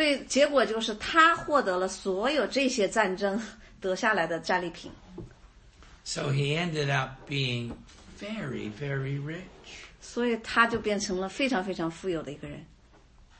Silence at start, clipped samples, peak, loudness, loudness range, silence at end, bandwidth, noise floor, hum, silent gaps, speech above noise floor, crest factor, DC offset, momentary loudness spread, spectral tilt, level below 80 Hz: 0 s; under 0.1%; -8 dBFS; -28 LUFS; 7 LU; 0.75 s; 8.8 kHz; -56 dBFS; none; none; 28 dB; 22 dB; under 0.1%; 19 LU; -4.5 dB/octave; -56 dBFS